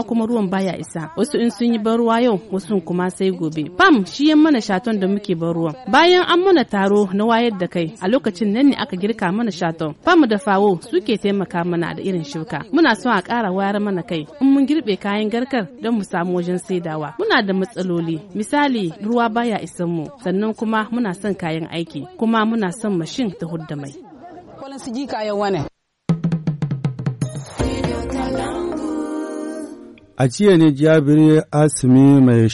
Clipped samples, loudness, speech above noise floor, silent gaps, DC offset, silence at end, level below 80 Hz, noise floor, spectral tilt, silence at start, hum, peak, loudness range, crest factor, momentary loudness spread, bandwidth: under 0.1%; -18 LUFS; 22 dB; none; under 0.1%; 0 s; -46 dBFS; -39 dBFS; -6 dB/octave; 0 s; none; -2 dBFS; 8 LU; 16 dB; 12 LU; 11.5 kHz